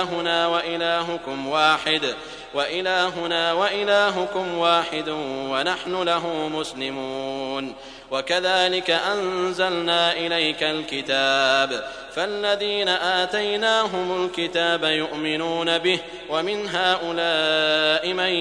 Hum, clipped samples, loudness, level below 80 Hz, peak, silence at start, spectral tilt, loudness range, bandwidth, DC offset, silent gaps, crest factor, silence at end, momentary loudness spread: none; under 0.1%; -22 LUFS; -58 dBFS; -4 dBFS; 0 s; -3 dB/octave; 3 LU; 10.5 kHz; under 0.1%; none; 20 dB; 0 s; 9 LU